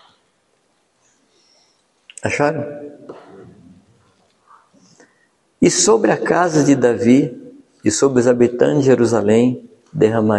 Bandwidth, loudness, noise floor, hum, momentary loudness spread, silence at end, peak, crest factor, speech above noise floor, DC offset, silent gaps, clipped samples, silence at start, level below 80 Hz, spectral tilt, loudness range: 11.5 kHz; -15 LUFS; -63 dBFS; none; 15 LU; 0 s; 0 dBFS; 16 dB; 48 dB; under 0.1%; none; under 0.1%; 2.25 s; -56 dBFS; -5 dB/octave; 12 LU